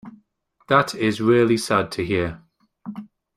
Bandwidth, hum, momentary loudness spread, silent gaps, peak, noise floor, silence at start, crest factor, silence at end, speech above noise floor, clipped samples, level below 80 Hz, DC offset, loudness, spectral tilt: 14.5 kHz; none; 19 LU; none; -2 dBFS; -63 dBFS; 0.05 s; 20 dB; 0.3 s; 43 dB; under 0.1%; -54 dBFS; under 0.1%; -20 LUFS; -5.5 dB/octave